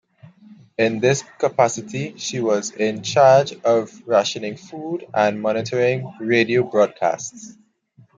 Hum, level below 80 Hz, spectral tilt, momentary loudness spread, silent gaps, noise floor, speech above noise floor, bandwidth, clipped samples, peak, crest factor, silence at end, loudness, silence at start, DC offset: none; -66 dBFS; -4.5 dB/octave; 13 LU; none; -54 dBFS; 34 dB; 9.4 kHz; under 0.1%; -2 dBFS; 18 dB; 0.65 s; -20 LUFS; 0.5 s; under 0.1%